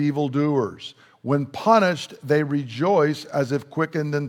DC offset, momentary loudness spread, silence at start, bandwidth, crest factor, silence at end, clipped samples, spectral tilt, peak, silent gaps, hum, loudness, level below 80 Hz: under 0.1%; 12 LU; 0 s; 14 kHz; 20 dB; 0 s; under 0.1%; -7 dB/octave; -2 dBFS; none; none; -22 LUFS; -70 dBFS